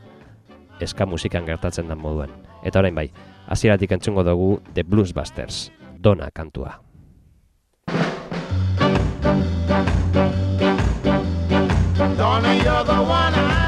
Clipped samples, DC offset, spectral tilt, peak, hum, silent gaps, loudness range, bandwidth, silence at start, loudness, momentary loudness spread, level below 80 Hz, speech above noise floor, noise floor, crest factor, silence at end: under 0.1%; under 0.1%; -6.5 dB/octave; -2 dBFS; none; none; 6 LU; 11 kHz; 0.05 s; -20 LUFS; 12 LU; -32 dBFS; 40 dB; -61 dBFS; 18 dB; 0 s